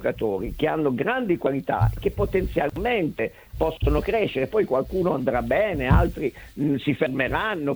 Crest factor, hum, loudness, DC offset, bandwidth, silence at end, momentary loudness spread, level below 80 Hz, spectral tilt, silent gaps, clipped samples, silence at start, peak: 18 dB; none; -24 LUFS; under 0.1%; over 20 kHz; 0 s; 5 LU; -34 dBFS; -8 dB/octave; none; under 0.1%; 0 s; -6 dBFS